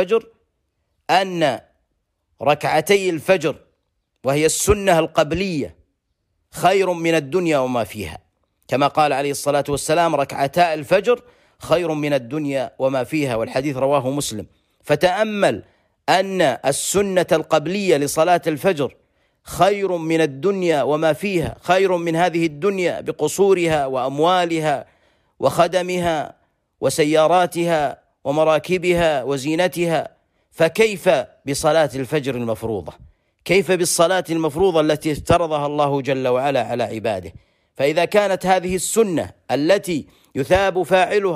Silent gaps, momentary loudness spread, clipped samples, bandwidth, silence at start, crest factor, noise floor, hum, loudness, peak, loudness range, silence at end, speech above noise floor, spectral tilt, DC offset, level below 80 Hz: none; 8 LU; under 0.1%; 15.5 kHz; 0 s; 16 dB; -71 dBFS; none; -19 LUFS; -4 dBFS; 2 LU; 0 s; 53 dB; -4.5 dB/octave; under 0.1%; -48 dBFS